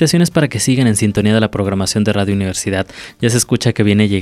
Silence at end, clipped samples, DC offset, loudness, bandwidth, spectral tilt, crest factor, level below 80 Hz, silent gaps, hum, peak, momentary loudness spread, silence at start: 0 s; under 0.1%; under 0.1%; -15 LUFS; 14.5 kHz; -5 dB/octave; 12 dB; -44 dBFS; none; none; -2 dBFS; 6 LU; 0 s